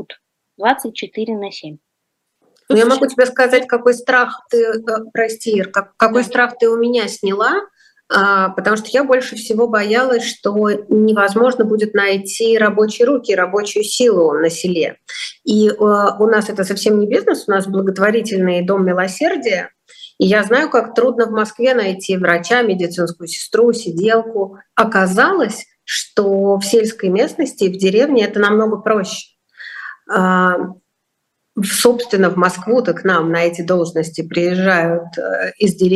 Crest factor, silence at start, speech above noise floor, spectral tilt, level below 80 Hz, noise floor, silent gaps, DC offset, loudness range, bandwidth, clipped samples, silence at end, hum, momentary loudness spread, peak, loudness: 16 dB; 0 s; 58 dB; -4.5 dB/octave; -64 dBFS; -73 dBFS; none; under 0.1%; 2 LU; 12.5 kHz; under 0.1%; 0 s; none; 8 LU; 0 dBFS; -15 LUFS